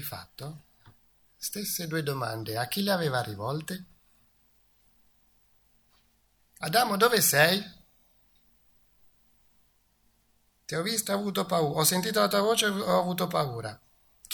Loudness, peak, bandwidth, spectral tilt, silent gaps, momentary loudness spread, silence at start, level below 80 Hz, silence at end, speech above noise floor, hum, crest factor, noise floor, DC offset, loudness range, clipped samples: -27 LUFS; -6 dBFS; 19.5 kHz; -3.5 dB/octave; none; 17 LU; 0 s; -68 dBFS; 0 s; 41 dB; 50 Hz at -65 dBFS; 24 dB; -68 dBFS; under 0.1%; 11 LU; under 0.1%